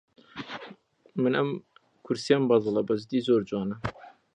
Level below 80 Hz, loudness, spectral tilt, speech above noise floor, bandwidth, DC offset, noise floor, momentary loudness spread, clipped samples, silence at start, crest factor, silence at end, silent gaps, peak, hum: -62 dBFS; -27 LUFS; -6.5 dB/octave; 26 dB; 10 kHz; under 0.1%; -52 dBFS; 17 LU; under 0.1%; 0.35 s; 22 dB; 0.25 s; none; -8 dBFS; none